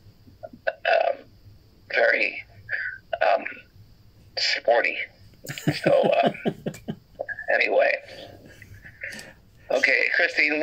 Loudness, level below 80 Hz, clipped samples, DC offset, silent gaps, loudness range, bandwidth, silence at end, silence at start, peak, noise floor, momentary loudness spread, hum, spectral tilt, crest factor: -23 LUFS; -60 dBFS; under 0.1%; under 0.1%; none; 2 LU; 16 kHz; 0 s; 0.45 s; -6 dBFS; -52 dBFS; 18 LU; none; -4.5 dB/octave; 20 dB